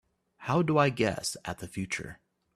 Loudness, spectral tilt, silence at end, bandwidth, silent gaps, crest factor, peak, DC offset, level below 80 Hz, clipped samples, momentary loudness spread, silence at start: -30 LUFS; -5 dB/octave; 0.4 s; 14.5 kHz; none; 20 dB; -10 dBFS; under 0.1%; -60 dBFS; under 0.1%; 13 LU; 0.4 s